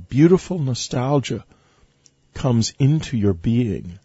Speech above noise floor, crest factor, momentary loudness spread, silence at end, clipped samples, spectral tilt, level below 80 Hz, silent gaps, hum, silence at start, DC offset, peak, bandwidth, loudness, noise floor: 39 dB; 18 dB; 10 LU; 0.1 s; under 0.1%; -6.5 dB/octave; -44 dBFS; none; none; 0 s; under 0.1%; -2 dBFS; 8 kHz; -20 LUFS; -58 dBFS